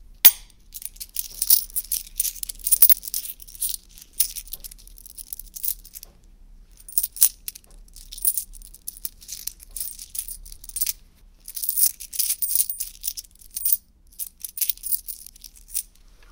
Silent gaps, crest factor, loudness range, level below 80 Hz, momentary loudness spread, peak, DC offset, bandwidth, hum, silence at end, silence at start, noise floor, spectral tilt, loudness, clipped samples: none; 26 dB; 10 LU; -48 dBFS; 20 LU; 0 dBFS; under 0.1%; 19 kHz; none; 0.5 s; 0 s; -51 dBFS; 2 dB/octave; -21 LUFS; under 0.1%